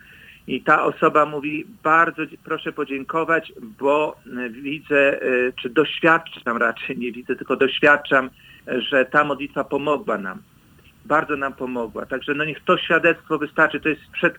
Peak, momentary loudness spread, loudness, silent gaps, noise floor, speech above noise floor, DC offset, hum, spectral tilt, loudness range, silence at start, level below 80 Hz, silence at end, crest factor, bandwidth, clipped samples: 0 dBFS; 12 LU; -21 LUFS; none; -52 dBFS; 31 dB; under 0.1%; none; -6 dB/octave; 3 LU; 0.3 s; -60 dBFS; 0 s; 20 dB; over 20 kHz; under 0.1%